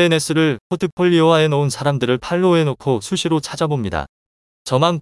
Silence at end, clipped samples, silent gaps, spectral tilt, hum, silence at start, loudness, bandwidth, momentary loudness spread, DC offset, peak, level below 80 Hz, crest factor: 0 s; under 0.1%; 0.61-0.70 s, 0.92-0.97 s, 4.09-4.65 s; -5.5 dB/octave; none; 0 s; -17 LUFS; 12 kHz; 9 LU; under 0.1%; 0 dBFS; -48 dBFS; 16 dB